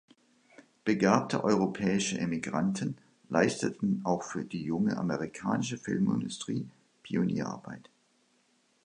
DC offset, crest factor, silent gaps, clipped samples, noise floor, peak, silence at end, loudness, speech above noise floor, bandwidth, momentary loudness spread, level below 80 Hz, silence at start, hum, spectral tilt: under 0.1%; 24 dB; none; under 0.1%; -70 dBFS; -8 dBFS; 1.05 s; -31 LUFS; 40 dB; 10.5 kHz; 10 LU; -66 dBFS; 0.85 s; none; -5.5 dB/octave